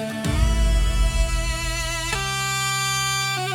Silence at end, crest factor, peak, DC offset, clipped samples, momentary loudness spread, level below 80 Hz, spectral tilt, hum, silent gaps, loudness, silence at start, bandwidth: 0 s; 16 dB; -6 dBFS; under 0.1%; under 0.1%; 4 LU; -24 dBFS; -3 dB/octave; none; none; -22 LUFS; 0 s; 16.5 kHz